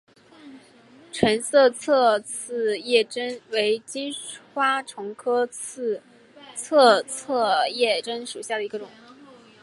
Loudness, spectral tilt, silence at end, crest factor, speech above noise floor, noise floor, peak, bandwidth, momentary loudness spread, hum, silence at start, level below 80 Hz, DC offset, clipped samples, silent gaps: -23 LUFS; -2.5 dB/octave; 0.75 s; 22 dB; 28 dB; -51 dBFS; -2 dBFS; 11.5 kHz; 15 LU; none; 0.45 s; -66 dBFS; under 0.1%; under 0.1%; none